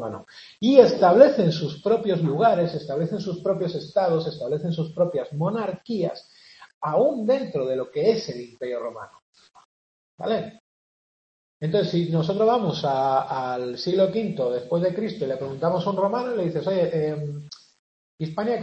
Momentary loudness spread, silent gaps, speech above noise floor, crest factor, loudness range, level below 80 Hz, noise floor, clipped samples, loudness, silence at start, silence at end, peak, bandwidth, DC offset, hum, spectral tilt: 15 LU; 6.74-6.81 s, 9.22-9.33 s, 9.65-10.18 s, 10.60-11.60 s, 17.79-18.18 s; over 67 dB; 22 dB; 9 LU; -66 dBFS; under -90 dBFS; under 0.1%; -23 LUFS; 0 s; 0 s; 0 dBFS; 8 kHz; under 0.1%; none; -7.5 dB/octave